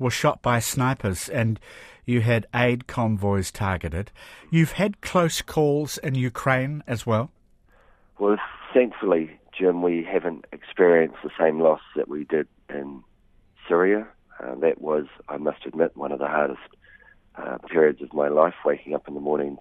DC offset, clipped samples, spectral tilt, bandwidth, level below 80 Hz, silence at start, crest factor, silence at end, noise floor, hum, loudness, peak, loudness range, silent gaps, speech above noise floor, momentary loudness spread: under 0.1%; under 0.1%; -6 dB/octave; 15.5 kHz; -50 dBFS; 0 s; 20 dB; 0.05 s; -58 dBFS; none; -24 LUFS; -4 dBFS; 4 LU; none; 35 dB; 14 LU